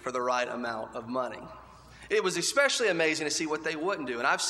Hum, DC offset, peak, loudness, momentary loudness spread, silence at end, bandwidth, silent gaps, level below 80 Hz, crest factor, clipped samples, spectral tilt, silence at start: none; under 0.1%; -10 dBFS; -29 LUFS; 11 LU; 0 s; 15 kHz; none; -64 dBFS; 20 dB; under 0.1%; -2 dB/octave; 0 s